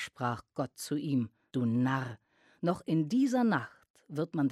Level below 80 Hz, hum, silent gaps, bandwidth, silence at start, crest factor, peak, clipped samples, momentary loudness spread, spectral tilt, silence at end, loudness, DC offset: -72 dBFS; none; 3.90-3.94 s; 14 kHz; 0 s; 16 dB; -16 dBFS; under 0.1%; 11 LU; -6.5 dB/octave; 0 s; -32 LUFS; under 0.1%